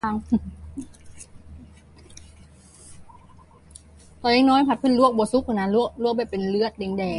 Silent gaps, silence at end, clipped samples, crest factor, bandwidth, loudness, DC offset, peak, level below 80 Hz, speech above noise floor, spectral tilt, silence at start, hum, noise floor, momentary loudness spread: none; 0 s; under 0.1%; 20 dB; 11.5 kHz; -22 LUFS; under 0.1%; -6 dBFS; -48 dBFS; 29 dB; -6 dB/octave; 0.05 s; none; -50 dBFS; 20 LU